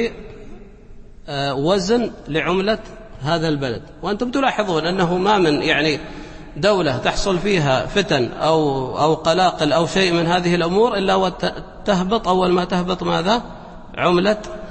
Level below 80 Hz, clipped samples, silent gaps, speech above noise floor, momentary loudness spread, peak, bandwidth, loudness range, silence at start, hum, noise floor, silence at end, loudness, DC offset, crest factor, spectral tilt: -38 dBFS; under 0.1%; none; 21 dB; 10 LU; -4 dBFS; 8.8 kHz; 4 LU; 0 s; none; -39 dBFS; 0 s; -19 LUFS; under 0.1%; 16 dB; -5.5 dB/octave